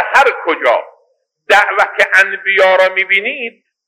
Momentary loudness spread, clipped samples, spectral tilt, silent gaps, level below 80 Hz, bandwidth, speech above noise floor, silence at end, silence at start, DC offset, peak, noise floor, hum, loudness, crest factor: 8 LU; 0.1%; -1.5 dB/octave; none; -60 dBFS; 16 kHz; 47 dB; 0.4 s; 0 s; under 0.1%; 0 dBFS; -59 dBFS; none; -11 LUFS; 12 dB